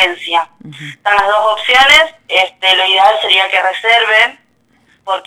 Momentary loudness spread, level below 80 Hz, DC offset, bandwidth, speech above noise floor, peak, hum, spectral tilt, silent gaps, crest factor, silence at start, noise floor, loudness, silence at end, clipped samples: 12 LU; -48 dBFS; under 0.1%; 18.5 kHz; 42 dB; 0 dBFS; none; -1 dB/octave; none; 12 dB; 0 s; -54 dBFS; -10 LUFS; 0.05 s; 0.1%